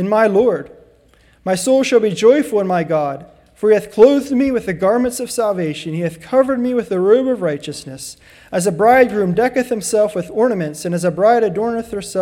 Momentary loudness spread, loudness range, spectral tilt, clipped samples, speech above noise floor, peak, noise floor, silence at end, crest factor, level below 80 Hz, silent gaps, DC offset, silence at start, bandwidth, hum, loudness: 12 LU; 3 LU; -5.5 dB/octave; under 0.1%; 36 dB; 0 dBFS; -51 dBFS; 0 s; 16 dB; -52 dBFS; none; under 0.1%; 0 s; 16.5 kHz; none; -16 LUFS